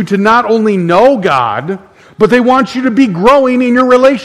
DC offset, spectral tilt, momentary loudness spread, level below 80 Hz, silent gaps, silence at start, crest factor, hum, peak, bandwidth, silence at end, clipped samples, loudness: 0.3%; -6.5 dB/octave; 6 LU; -42 dBFS; none; 0 s; 8 dB; none; 0 dBFS; 12 kHz; 0 s; 1%; -9 LUFS